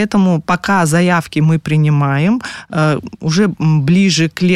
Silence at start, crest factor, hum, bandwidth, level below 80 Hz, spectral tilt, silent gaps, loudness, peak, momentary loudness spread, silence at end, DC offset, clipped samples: 0 s; 10 dB; none; 13 kHz; -48 dBFS; -6 dB/octave; none; -14 LUFS; -2 dBFS; 5 LU; 0 s; under 0.1%; under 0.1%